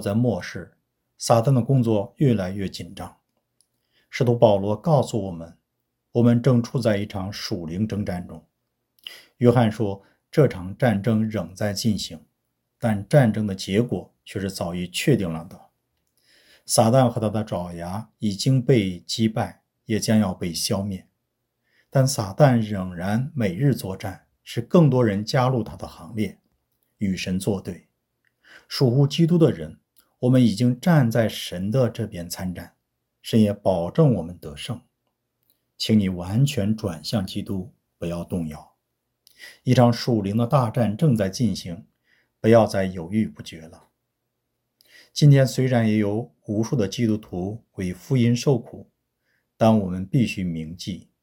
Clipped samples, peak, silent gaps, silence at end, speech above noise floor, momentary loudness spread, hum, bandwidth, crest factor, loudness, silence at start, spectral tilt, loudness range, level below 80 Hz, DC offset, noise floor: under 0.1%; -2 dBFS; none; 0.25 s; 56 dB; 15 LU; none; 17 kHz; 22 dB; -22 LUFS; 0 s; -6.5 dB/octave; 4 LU; -56 dBFS; under 0.1%; -78 dBFS